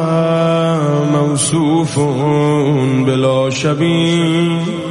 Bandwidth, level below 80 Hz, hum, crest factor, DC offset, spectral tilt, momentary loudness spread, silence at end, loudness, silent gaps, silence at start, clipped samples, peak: 11.5 kHz; -52 dBFS; none; 12 dB; 0.1%; -6 dB/octave; 2 LU; 0 s; -14 LUFS; none; 0 s; under 0.1%; -2 dBFS